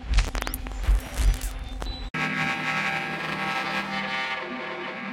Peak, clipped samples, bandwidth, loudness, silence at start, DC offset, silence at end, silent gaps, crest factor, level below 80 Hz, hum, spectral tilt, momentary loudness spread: -8 dBFS; under 0.1%; 16 kHz; -28 LUFS; 0 s; under 0.1%; 0 s; 2.10-2.14 s; 20 dB; -30 dBFS; none; -4 dB/octave; 7 LU